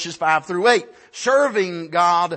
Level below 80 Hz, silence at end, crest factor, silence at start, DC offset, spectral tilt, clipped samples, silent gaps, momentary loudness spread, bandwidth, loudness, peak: -70 dBFS; 0 s; 16 dB; 0 s; under 0.1%; -3.5 dB/octave; under 0.1%; none; 6 LU; 8.8 kHz; -19 LUFS; -4 dBFS